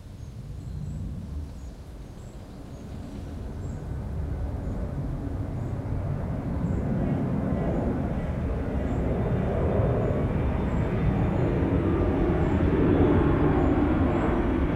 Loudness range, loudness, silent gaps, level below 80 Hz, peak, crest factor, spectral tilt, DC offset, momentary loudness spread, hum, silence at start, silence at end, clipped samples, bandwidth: 14 LU; -27 LUFS; none; -34 dBFS; -10 dBFS; 16 dB; -9.5 dB/octave; under 0.1%; 17 LU; none; 0 s; 0 s; under 0.1%; 10.5 kHz